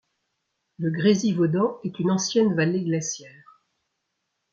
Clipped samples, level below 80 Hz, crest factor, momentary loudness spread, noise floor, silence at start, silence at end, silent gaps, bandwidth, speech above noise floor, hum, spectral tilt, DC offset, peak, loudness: under 0.1%; -68 dBFS; 18 dB; 9 LU; -78 dBFS; 0.8 s; 1.25 s; none; 7.8 kHz; 56 dB; none; -5.5 dB/octave; under 0.1%; -8 dBFS; -23 LUFS